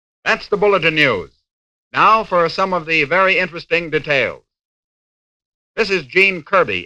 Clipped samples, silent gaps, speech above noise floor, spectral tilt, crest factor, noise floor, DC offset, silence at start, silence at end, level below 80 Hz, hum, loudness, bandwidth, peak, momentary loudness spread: under 0.1%; 1.53-1.91 s, 4.65-5.74 s; over 74 dB; -5 dB/octave; 18 dB; under -90 dBFS; under 0.1%; 0.25 s; 0 s; -50 dBFS; none; -15 LUFS; 10.5 kHz; 0 dBFS; 7 LU